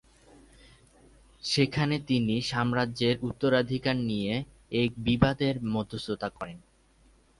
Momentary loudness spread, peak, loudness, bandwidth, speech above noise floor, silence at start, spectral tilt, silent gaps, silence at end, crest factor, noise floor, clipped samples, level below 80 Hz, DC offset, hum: 9 LU; -6 dBFS; -28 LUFS; 11.5 kHz; 34 dB; 1.45 s; -6 dB/octave; none; 0.8 s; 24 dB; -62 dBFS; under 0.1%; -52 dBFS; under 0.1%; none